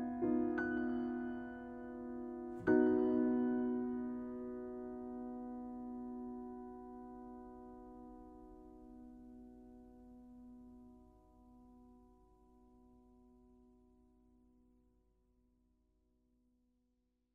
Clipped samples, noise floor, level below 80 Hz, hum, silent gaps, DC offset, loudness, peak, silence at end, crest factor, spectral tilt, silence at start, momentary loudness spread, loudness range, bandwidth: under 0.1%; -82 dBFS; -68 dBFS; none; none; under 0.1%; -40 LUFS; -20 dBFS; 4.05 s; 22 dB; -9 dB/octave; 0 s; 24 LU; 23 LU; 3.2 kHz